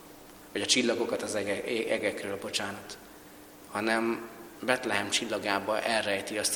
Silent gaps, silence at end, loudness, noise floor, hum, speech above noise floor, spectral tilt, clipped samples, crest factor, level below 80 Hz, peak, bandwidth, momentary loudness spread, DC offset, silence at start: none; 0 s; -30 LUFS; -50 dBFS; none; 20 dB; -2 dB/octave; under 0.1%; 22 dB; -68 dBFS; -8 dBFS; 19 kHz; 20 LU; under 0.1%; 0 s